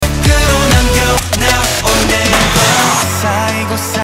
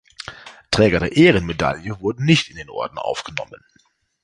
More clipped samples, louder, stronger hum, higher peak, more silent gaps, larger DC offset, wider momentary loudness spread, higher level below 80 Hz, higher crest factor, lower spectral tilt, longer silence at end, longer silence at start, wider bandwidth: neither; first, -11 LUFS vs -19 LUFS; neither; about the same, 0 dBFS vs -2 dBFS; neither; neither; second, 5 LU vs 19 LU; first, -20 dBFS vs -42 dBFS; second, 12 dB vs 18 dB; second, -3.5 dB/octave vs -5.5 dB/octave; second, 0 s vs 0.7 s; second, 0 s vs 0.3 s; first, 16.5 kHz vs 11 kHz